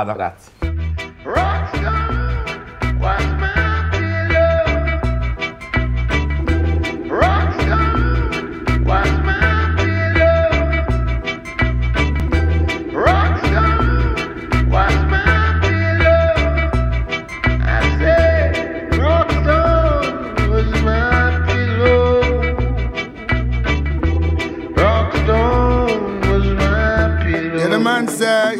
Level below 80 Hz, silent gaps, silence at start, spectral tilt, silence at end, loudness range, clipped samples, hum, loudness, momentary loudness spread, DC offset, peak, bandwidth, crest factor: -20 dBFS; none; 0 s; -6.5 dB/octave; 0 s; 3 LU; under 0.1%; none; -17 LUFS; 8 LU; under 0.1%; 0 dBFS; 12 kHz; 14 dB